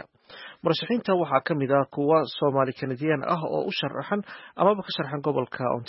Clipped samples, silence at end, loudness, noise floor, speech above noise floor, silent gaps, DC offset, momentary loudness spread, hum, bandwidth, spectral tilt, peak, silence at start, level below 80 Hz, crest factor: under 0.1%; 0.05 s; -26 LUFS; -46 dBFS; 21 dB; none; under 0.1%; 8 LU; none; 5.8 kHz; -10.5 dB/octave; -6 dBFS; 0.3 s; -70 dBFS; 20 dB